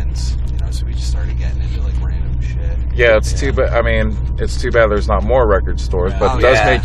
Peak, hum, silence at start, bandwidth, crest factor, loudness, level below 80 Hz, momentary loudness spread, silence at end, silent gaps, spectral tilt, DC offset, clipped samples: 0 dBFS; none; 0 s; 10.5 kHz; 14 dB; -16 LUFS; -18 dBFS; 9 LU; 0 s; none; -6 dB/octave; under 0.1%; under 0.1%